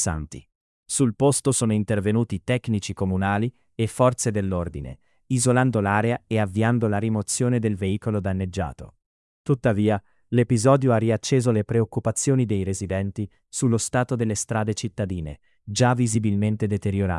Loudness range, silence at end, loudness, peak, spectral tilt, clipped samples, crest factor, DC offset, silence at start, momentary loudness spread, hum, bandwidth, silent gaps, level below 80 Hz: 3 LU; 0 s; -23 LUFS; -6 dBFS; -5.5 dB/octave; under 0.1%; 16 dB; under 0.1%; 0 s; 10 LU; none; 12 kHz; 0.55-0.83 s, 9.06-9.44 s; -50 dBFS